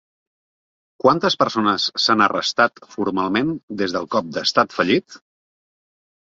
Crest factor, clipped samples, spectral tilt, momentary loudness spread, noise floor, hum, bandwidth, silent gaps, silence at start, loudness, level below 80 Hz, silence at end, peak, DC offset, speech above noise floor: 20 dB; under 0.1%; -4 dB/octave; 7 LU; under -90 dBFS; none; 7.8 kHz; 3.63-3.68 s; 1.05 s; -19 LUFS; -60 dBFS; 1.05 s; -2 dBFS; under 0.1%; over 71 dB